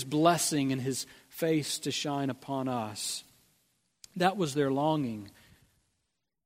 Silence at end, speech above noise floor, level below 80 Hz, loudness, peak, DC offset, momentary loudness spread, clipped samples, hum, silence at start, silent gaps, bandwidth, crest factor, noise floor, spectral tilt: 1.15 s; 52 dB; -72 dBFS; -30 LUFS; -10 dBFS; under 0.1%; 12 LU; under 0.1%; none; 0 s; none; 16 kHz; 22 dB; -82 dBFS; -4.5 dB/octave